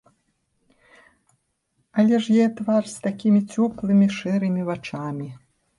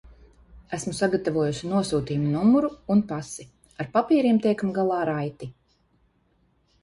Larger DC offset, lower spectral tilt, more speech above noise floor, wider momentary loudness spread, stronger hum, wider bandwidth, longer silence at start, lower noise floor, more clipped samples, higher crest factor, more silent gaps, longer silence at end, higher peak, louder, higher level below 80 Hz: neither; about the same, -7 dB/octave vs -6.5 dB/octave; first, 51 dB vs 42 dB; second, 11 LU vs 15 LU; neither; about the same, 11.5 kHz vs 11.5 kHz; first, 1.95 s vs 0.05 s; first, -71 dBFS vs -66 dBFS; neither; about the same, 14 dB vs 18 dB; neither; second, 0.4 s vs 1.3 s; about the same, -10 dBFS vs -8 dBFS; about the same, -22 LUFS vs -24 LUFS; second, -62 dBFS vs -56 dBFS